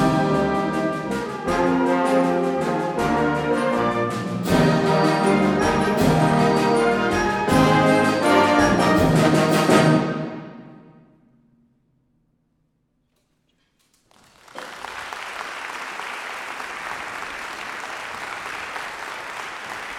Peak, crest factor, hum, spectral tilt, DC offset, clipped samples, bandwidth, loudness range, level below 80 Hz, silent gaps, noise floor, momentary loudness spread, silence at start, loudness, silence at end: -2 dBFS; 20 dB; none; -6 dB/octave; under 0.1%; under 0.1%; 16.5 kHz; 16 LU; -46 dBFS; none; -68 dBFS; 15 LU; 0 s; -21 LUFS; 0 s